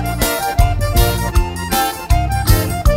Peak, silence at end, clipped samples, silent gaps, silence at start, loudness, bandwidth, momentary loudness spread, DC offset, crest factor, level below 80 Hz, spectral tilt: 0 dBFS; 0 s; under 0.1%; none; 0 s; -16 LUFS; 16.5 kHz; 3 LU; under 0.1%; 14 dB; -18 dBFS; -4.5 dB/octave